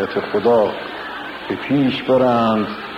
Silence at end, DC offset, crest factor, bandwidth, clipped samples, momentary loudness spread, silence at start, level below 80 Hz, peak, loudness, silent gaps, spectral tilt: 0 s; under 0.1%; 14 dB; 15 kHz; under 0.1%; 13 LU; 0 s; -54 dBFS; -4 dBFS; -18 LUFS; none; -7.5 dB/octave